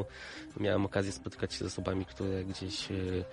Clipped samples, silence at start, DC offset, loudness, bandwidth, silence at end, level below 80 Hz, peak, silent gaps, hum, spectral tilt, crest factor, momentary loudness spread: under 0.1%; 0 s; under 0.1%; -36 LUFS; 11.5 kHz; 0 s; -56 dBFS; -16 dBFS; none; none; -5.5 dB/octave; 20 dB; 8 LU